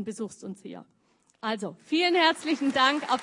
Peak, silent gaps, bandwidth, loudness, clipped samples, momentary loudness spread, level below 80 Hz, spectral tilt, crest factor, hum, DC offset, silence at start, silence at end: -6 dBFS; none; 11 kHz; -25 LUFS; under 0.1%; 19 LU; -80 dBFS; -3.5 dB/octave; 22 dB; none; under 0.1%; 0 s; 0 s